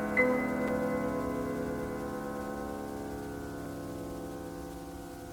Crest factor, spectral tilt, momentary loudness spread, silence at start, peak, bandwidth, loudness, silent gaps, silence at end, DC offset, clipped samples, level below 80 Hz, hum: 20 dB; -6 dB/octave; 12 LU; 0 s; -14 dBFS; 19.5 kHz; -35 LUFS; none; 0 s; under 0.1%; under 0.1%; -52 dBFS; none